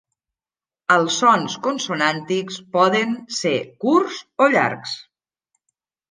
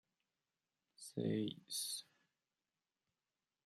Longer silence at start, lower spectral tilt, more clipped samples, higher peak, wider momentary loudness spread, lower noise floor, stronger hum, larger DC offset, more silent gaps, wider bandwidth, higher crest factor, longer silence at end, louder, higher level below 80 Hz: about the same, 0.9 s vs 1 s; about the same, -4 dB/octave vs -4.5 dB/octave; neither; first, -2 dBFS vs -26 dBFS; about the same, 10 LU vs 9 LU; about the same, under -90 dBFS vs under -90 dBFS; neither; neither; neither; second, 10 kHz vs 14.5 kHz; about the same, 20 dB vs 22 dB; second, 1.1 s vs 1.65 s; first, -19 LUFS vs -43 LUFS; first, -72 dBFS vs -90 dBFS